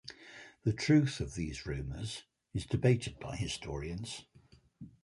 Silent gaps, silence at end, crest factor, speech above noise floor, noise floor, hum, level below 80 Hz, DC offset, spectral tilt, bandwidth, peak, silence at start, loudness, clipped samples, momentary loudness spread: none; 0.15 s; 20 dB; 30 dB; -63 dBFS; none; -52 dBFS; under 0.1%; -6 dB/octave; 11.5 kHz; -14 dBFS; 0.05 s; -35 LUFS; under 0.1%; 20 LU